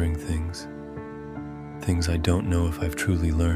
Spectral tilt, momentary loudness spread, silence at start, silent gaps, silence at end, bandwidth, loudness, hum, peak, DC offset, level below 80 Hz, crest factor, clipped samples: -6 dB/octave; 14 LU; 0 s; none; 0 s; 15 kHz; -27 LUFS; none; -8 dBFS; under 0.1%; -34 dBFS; 18 dB; under 0.1%